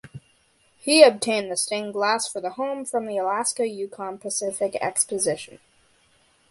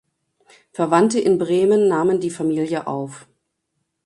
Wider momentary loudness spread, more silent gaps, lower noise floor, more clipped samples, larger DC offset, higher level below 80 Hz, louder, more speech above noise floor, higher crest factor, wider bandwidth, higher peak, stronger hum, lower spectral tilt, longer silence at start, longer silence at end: first, 17 LU vs 12 LU; neither; second, -62 dBFS vs -75 dBFS; neither; neither; second, -70 dBFS vs -64 dBFS; second, -23 LUFS vs -19 LUFS; second, 39 dB vs 57 dB; first, 24 dB vs 18 dB; about the same, 11.5 kHz vs 11.5 kHz; about the same, 0 dBFS vs -2 dBFS; neither; second, -2 dB/octave vs -6 dB/octave; second, 0.05 s vs 0.8 s; first, 1.05 s vs 0.85 s